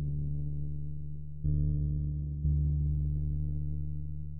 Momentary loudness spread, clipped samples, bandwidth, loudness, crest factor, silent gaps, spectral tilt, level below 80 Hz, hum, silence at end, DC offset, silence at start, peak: 9 LU; under 0.1%; 0.8 kHz; -34 LUFS; 14 dB; none; -19.5 dB/octave; -36 dBFS; none; 0 s; under 0.1%; 0 s; -18 dBFS